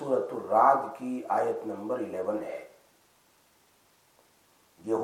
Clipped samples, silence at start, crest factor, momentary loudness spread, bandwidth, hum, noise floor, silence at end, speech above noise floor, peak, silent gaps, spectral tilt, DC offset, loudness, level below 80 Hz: under 0.1%; 0 s; 22 dB; 15 LU; 16 kHz; none; -65 dBFS; 0 s; 37 dB; -8 dBFS; none; -6.5 dB/octave; under 0.1%; -29 LUFS; -82 dBFS